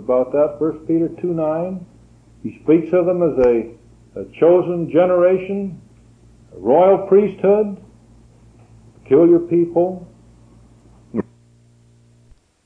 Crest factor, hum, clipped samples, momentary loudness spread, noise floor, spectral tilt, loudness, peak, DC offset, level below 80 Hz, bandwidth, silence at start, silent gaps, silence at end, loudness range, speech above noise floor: 14 dB; none; under 0.1%; 20 LU; -51 dBFS; -10 dB/octave; -17 LUFS; -4 dBFS; under 0.1%; -50 dBFS; 3.5 kHz; 0 s; none; 1.45 s; 3 LU; 36 dB